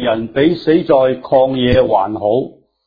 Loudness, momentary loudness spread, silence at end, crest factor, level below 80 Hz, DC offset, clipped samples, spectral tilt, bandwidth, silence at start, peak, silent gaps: -14 LUFS; 5 LU; 0.35 s; 14 dB; -40 dBFS; under 0.1%; under 0.1%; -9 dB/octave; 5 kHz; 0 s; 0 dBFS; none